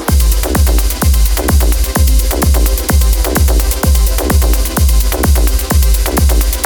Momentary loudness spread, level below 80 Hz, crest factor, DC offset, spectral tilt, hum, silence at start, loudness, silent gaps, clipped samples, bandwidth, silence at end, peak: 1 LU; -10 dBFS; 10 dB; under 0.1%; -4.5 dB/octave; none; 0 s; -12 LUFS; none; under 0.1%; 19.5 kHz; 0 s; 0 dBFS